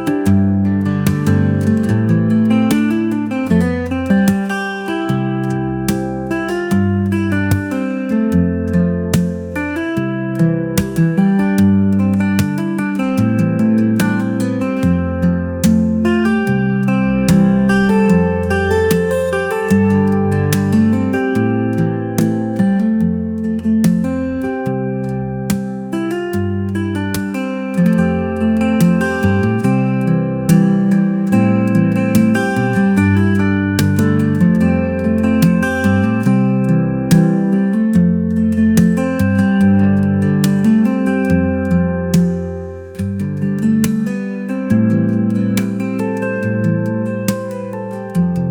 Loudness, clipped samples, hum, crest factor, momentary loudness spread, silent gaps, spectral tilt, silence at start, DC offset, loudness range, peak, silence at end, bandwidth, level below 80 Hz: -15 LUFS; under 0.1%; none; 14 dB; 7 LU; none; -7.5 dB/octave; 0 s; under 0.1%; 4 LU; 0 dBFS; 0 s; 19 kHz; -42 dBFS